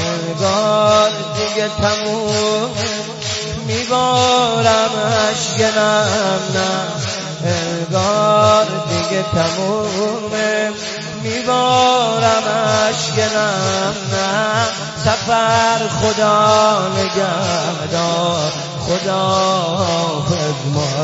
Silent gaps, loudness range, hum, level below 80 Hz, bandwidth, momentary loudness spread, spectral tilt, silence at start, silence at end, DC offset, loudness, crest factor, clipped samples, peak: none; 2 LU; none; -46 dBFS; 8 kHz; 8 LU; -4 dB/octave; 0 s; 0 s; under 0.1%; -16 LUFS; 16 dB; under 0.1%; 0 dBFS